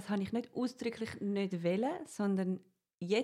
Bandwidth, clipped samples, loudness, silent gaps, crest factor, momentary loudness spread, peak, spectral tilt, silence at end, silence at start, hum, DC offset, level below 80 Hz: 12.5 kHz; under 0.1%; -36 LUFS; 2.94-2.98 s; 14 dB; 6 LU; -20 dBFS; -6.5 dB/octave; 0 s; 0 s; none; under 0.1%; -74 dBFS